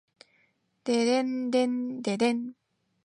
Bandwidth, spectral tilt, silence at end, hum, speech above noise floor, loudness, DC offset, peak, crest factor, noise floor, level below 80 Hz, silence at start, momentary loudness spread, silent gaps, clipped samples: 10.5 kHz; -4.5 dB/octave; 0.55 s; none; 43 dB; -28 LUFS; under 0.1%; -14 dBFS; 16 dB; -70 dBFS; -80 dBFS; 0.85 s; 9 LU; none; under 0.1%